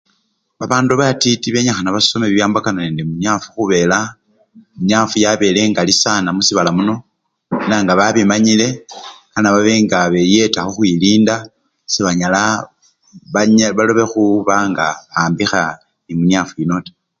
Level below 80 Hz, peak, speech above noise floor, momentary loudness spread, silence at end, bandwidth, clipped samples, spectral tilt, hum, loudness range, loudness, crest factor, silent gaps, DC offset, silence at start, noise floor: -50 dBFS; 0 dBFS; 50 dB; 9 LU; 0.3 s; 9 kHz; under 0.1%; -4 dB/octave; none; 2 LU; -14 LUFS; 14 dB; none; under 0.1%; 0.6 s; -64 dBFS